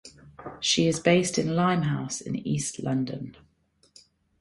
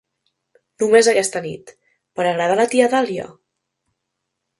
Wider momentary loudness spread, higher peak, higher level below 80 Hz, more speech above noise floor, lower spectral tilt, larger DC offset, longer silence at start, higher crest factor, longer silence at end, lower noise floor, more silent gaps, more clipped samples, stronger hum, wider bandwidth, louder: second, 16 LU vs 19 LU; second, -8 dBFS vs 0 dBFS; first, -60 dBFS vs -66 dBFS; second, 40 dB vs 61 dB; about the same, -4.5 dB/octave vs -3.5 dB/octave; neither; second, 0.05 s vs 0.8 s; about the same, 20 dB vs 20 dB; second, 1.1 s vs 1.3 s; second, -66 dBFS vs -77 dBFS; neither; neither; neither; about the same, 11.5 kHz vs 11.5 kHz; second, -26 LUFS vs -17 LUFS